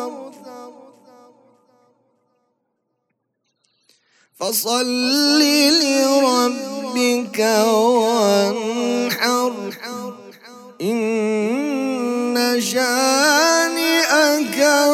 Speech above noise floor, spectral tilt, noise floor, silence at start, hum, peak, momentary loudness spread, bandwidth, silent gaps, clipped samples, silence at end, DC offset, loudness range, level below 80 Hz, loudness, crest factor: 57 dB; -2 dB/octave; -73 dBFS; 0 s; none; -2 dBFS; 14 LU; 16.5 kHz; none; under 0.1%; 0 s; under 0.1%; 7 LU; -84 dBFS; -17 LUFS; 16 dB